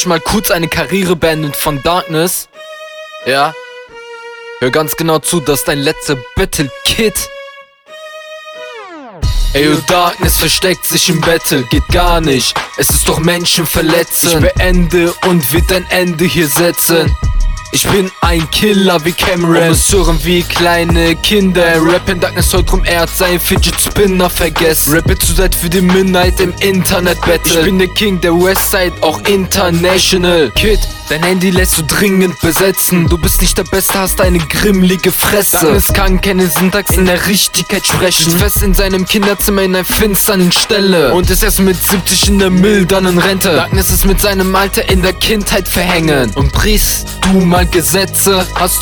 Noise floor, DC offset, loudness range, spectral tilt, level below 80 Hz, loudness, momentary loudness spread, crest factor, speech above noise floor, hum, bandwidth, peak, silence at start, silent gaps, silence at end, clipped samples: -34 dBFS; under 0.1%; 5 LU; -4 dB/octave; -20 dBFS; -10 LUFS; 6 LU; 10 dB; 24 dB; none; 19.5 kHz; 0 dBFS; 0 s; none; 0 s; under 0.1%